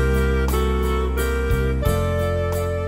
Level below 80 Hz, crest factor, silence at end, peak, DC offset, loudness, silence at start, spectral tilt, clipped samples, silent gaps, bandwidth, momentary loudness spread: -24 dBFS; 14 dB; 0 s; -6 dBFS; under 0.1%; -22 LUFS; 0 s; -6.5 dB/octave; under 0.1%; none; 16 kHz; 2 LU